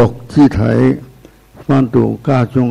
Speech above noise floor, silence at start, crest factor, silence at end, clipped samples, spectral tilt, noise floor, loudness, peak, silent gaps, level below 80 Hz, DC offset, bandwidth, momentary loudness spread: 29 dB; 0 s; 12 dB; 0 s; under 0.1%; -9 dB/octave; -41 dBFS; -13 LUFS; -2 dBFS; none; -36 dBFS; under 0.1%; 10.5 kHz; 5 LU